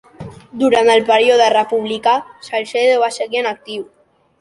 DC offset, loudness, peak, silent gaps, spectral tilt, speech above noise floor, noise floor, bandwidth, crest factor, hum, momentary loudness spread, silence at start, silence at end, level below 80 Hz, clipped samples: under 0.1%; -15 LUFS; 0 dBFS; none; -3.5 dB/octave; 20 dB; -35 dBFS; 11.5 kHz; 16 dB; none; 17 LU; 0.2 s; 0.55 s; -58 dBFS; under 0.1%